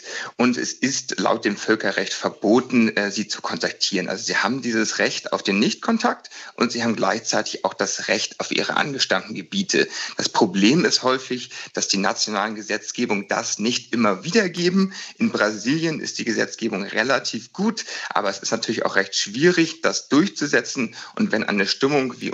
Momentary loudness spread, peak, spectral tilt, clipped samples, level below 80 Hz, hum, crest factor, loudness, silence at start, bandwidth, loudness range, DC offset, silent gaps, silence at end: 7 LU; -2 dBFS; -3.5 dB/octave; under 0.1%; -72 dBFS; none; 20 dB; -21 LUFS; 0 s; 8.2 kHz; 2 LU; under 0.1%; none; 0 s